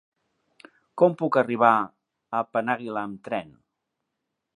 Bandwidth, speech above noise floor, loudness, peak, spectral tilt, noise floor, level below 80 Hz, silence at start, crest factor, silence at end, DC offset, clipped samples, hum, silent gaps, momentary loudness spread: 10.5 kHz; 58 dB; -24 LUFS; -4 dBFS; -7.5 dB/octave; -82 dBFS; -74 dBFS; 0.95 s; 24 dB; 1.15 s; under 0.1%; under 0.1%; none; none; 13 LU